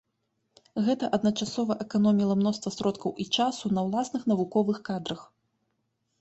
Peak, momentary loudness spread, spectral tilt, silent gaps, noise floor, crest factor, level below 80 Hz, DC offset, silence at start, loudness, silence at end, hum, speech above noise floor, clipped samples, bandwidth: -10 dBFS; 9 LU; -6 dB/octave; none; -77 dBFS; 18 dB; -66 dBFS; under 0.1%; 0.75 s; -28 LUFS; 0.95 s; none; 51 dB; under 0.1%; 8.2 kHz